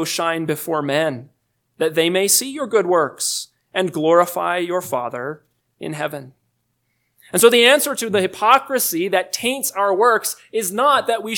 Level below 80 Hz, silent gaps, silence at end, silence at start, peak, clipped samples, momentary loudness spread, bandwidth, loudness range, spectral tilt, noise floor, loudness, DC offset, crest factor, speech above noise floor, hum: -70 dBFS; none; 0 s; 0 s; 0 dBFS; under 0.1%; 12 LU; 19 kHz; 5 LU; -2.5 dB/octave; -70 dBFS; -18 LUFS; under 0.1%; 20 dB; 51 dB; none